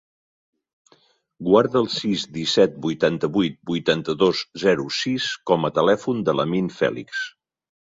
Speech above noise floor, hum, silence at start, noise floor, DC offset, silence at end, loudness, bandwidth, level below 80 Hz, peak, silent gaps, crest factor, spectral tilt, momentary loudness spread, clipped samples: 39 dB; none; 1.4 s; -60 dBFS; under 0.1%; 0.55 s; -21 LUFS; 7.8 kHz; -60 dBFS; -2 dBFS; none; 20 dB; -5 dB/octave; 6 LU; under 0.1%